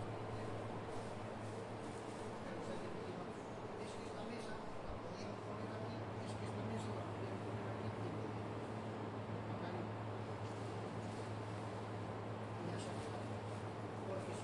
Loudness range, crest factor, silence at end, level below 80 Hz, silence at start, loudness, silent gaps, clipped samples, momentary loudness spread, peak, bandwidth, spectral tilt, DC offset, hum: 2 LU; 12 dB; 0 s; -68 dBFS; 0 s; -46 LUFS; none; under 0.1%; 3 LU; -32 dBFS; 11.5 kHz; -6.5 dB/octave; under 0.1%; none